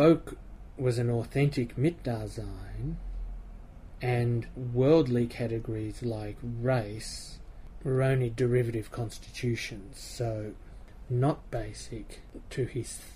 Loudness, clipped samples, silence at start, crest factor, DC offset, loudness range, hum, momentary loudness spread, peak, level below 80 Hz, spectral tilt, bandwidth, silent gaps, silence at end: -31 LUFS; under 0.1%; 0 s; 20 dB; under 0.1%; 5 LU; none; 19 LU; -10 dBFS; -46 dBFS; -7 dB/octave; 15 kHz; none; 0 s